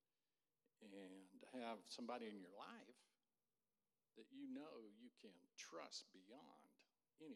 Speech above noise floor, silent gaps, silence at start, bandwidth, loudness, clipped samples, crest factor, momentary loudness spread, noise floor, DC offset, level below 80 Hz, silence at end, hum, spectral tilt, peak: over 32 dB; none; 0.8 s; 12.5 kHz; -58 LUFS; under 0.1%; 22 dB; 13 LU; under -90 dBFS; under 0.1%; under -90 dBFS; 0 s; none; -3 dB/octave; -38 dBFS